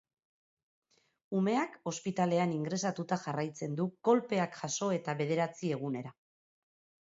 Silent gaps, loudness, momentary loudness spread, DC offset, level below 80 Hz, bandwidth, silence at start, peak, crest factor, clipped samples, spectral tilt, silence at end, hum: none; -34 LUFS; 8 LU; under 0.1%; -80 dBFS; 7.6 kHz; 1.3 s; -14 dBFS; 20 dB; under 0.1%; -6 dB/octave; 0.95 s; none